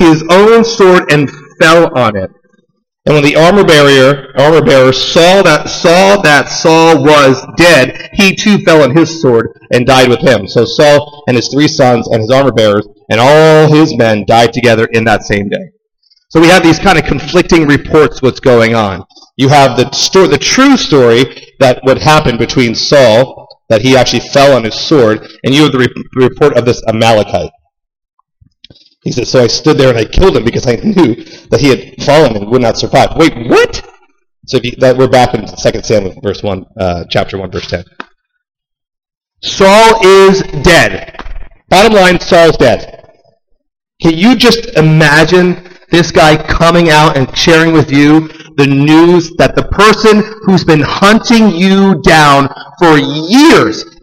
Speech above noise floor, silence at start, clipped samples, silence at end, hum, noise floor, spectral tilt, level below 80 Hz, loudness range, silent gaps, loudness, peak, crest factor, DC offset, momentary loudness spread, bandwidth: 50 dB; 0 s; under 0.1%; 0.2 s; none; -57 dBFS; -5 dB/octave; -28 dBFS; 6 LU; 39.17-39.21 s; -7 LUFS; 0 dBFS; 8 dB; under 0.1%; 9 LU; 16.5 kHz